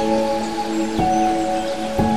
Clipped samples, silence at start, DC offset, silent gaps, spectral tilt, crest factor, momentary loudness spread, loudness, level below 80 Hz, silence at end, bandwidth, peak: under 0.1%; 0 s; 2%; none; -5.5 dB/octave; 12 dB; 5 LU; -20 LUFS; -40 dBFS; 0 s; 15 kHz; -8 dBFS